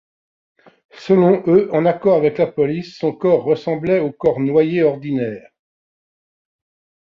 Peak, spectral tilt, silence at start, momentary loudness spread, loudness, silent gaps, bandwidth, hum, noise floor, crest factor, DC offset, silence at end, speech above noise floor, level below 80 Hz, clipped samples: -2 dBFS; -9 dB/octave; 0.95 s; 9 LU; -17 LUFS; none; 7 kHz; none; under -90 dBFS; 16 dB; under 0.1%; 1.8 s; over 74 dB; -58 dBFS; under 0.1%